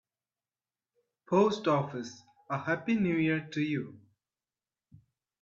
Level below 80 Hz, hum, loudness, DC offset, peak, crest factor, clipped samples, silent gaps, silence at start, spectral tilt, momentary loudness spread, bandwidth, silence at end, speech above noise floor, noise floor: -72 dBFS; none; -30 LUFS; under 0.1%; -12 dBFS; 20 dB; under 0.1%; none; 1.3 s; -6.5 dB/octave; 12 LU; 7.8 kHz; 1.45 s; over 60 dB; under -90 dBFS